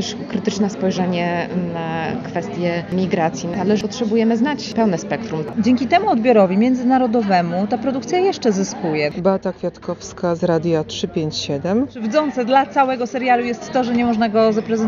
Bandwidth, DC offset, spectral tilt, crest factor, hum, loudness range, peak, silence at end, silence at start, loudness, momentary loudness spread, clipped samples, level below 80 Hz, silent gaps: 7.6 kHz; under 0.1%; -5 dB/octave; 16 dB; none; 4 LU; -2 dBFS; 0 s; 0 s; -19 LUFS; 8 LU; under 0.1%; -54 dBFS; none